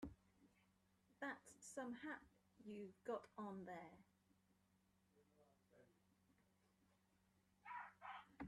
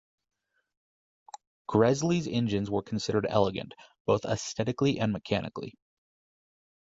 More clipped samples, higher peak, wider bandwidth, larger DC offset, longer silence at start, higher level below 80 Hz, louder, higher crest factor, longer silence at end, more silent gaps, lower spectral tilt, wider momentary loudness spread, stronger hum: neither; second, -36 dBFS vs -8 dBFS; first, 13 kHz vs 8 kHz; neither; second, 0 s vs 1.7 s; second, -82 dBFS vs -58 dBFS; second, -55 LUFS vs -29 LUFS; about the same, 22 dB vs 22 dB; second, 0 s vs 1.15 s; second, none vs 4.00-4.05 s; about the same, -5 dB/octave vs -6 dB/octave; second, 8 LU vs 14 LU; neither